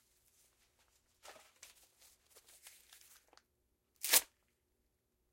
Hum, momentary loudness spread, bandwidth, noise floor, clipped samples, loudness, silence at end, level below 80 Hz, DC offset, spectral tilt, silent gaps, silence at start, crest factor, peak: 60 Hz at -95 dBFS; 28 LU; 16.5 kHz; -82 dBFS; under 0.1%; -32 LUFS; 1.1 s; -82 dBFS; under 0.1%; 2.5 dB/octave; none; 1.3 s; 34 dB; -12 dBFS